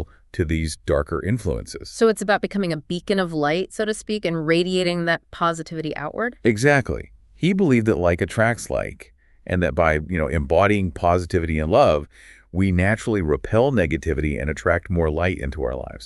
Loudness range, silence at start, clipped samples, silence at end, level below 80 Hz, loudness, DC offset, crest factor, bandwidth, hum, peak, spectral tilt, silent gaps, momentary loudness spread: 3 LU; 0 s; under 0.1%; 0 s; -34 dBFS; -21 LUFS; under 0.1%; 20 dB; 12 kHz; none; -2 dBFS; -6 dB/octave; none; 10 LU